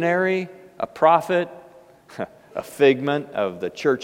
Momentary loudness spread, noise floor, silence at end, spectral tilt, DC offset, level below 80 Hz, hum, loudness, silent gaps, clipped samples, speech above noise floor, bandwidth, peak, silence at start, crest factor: 16 LU; -48 dBFS; 0 s; -6 dB/octave; under 0.1%; -66 dBFS; none; -21 LUFS; none; under 0.1%; 28 dB; 16 kHz; -4 dBFS; 0 s; 18 dB